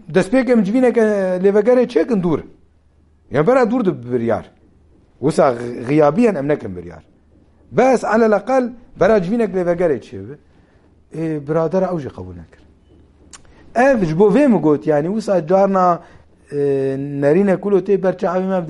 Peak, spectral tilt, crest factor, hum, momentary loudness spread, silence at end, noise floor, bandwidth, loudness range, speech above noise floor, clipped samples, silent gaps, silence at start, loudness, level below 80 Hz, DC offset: -2 dBFS; -7.5 dB/octave; 16 dB; none; 11 LU; 0 s; -53 dBFS; 11.5 kHz; 6 LU; 37 dB; under 0.1%; none; 0.1 s; -16 LUFS; -48 dBFS; under 0.1%